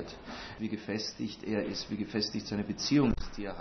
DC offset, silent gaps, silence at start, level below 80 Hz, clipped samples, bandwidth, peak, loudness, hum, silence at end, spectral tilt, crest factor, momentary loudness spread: under 0.1%; none; 0 s; -48 dBFS; under 0.1%; 6.4 kHz; -16 dBFS; -34 LUFS; none; 0 s; -5 dB/octave; 18 dB; 12 LU